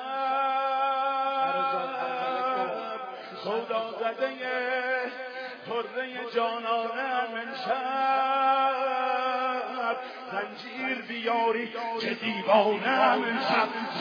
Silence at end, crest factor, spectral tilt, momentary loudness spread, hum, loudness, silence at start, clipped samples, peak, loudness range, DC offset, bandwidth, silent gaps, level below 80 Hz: 0 s; 20 dB; -5 dB/octave; 10 LU; none; -28 LUFS; 0 s; under 0.1%; -8 dBFS; 4 LU; under 0.1%; 5.4 kHz; none; under -90 dBFS